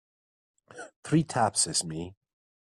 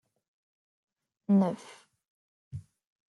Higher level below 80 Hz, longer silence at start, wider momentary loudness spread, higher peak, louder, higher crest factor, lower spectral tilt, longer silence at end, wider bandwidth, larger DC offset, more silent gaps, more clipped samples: first, -66 dBFS vs -72 dBFS; second, 0.75 s vs 1.3 s; about the same, 20 LU vs 20 LU; first, -12 dBFS vs -16 dBFS; about the same, -27 LUFS vs -27 LUFS; about the same, 20 dB vs 18 dB; second, -3.5 dB/octave vs -9 dB/octave; about the same, 0.65 s vs 0.6 s; first, 12.5 kHz vs 11 kHz; neither; second, 0.96-1.03 s vs 2.08-2.51 s; neither